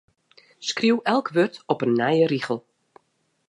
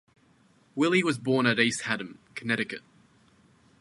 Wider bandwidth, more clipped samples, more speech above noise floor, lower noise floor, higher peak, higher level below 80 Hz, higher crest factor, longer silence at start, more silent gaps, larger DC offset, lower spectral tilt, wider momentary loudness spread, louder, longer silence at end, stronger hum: about the same, 11 kHz vs 11.5 kHz; neither; first, 48 dB vs 35 dB; first, -70 dBFS vs -62 dBFS; first, -4 dBFS vs -8 dBFS; about the same, -74 dBFS vs -70 dBFS; about the same, 20 dB vs 22 dB; second, 0.6 s vs 0.75 s; neither; neither; about the same, -5 dB/octave vs -4.5 dB/octave; second, 10 LU vs 16 LU; first, -23 LUFS vs -26 LUFS; about the same, 0.9 s vs 1 s; neither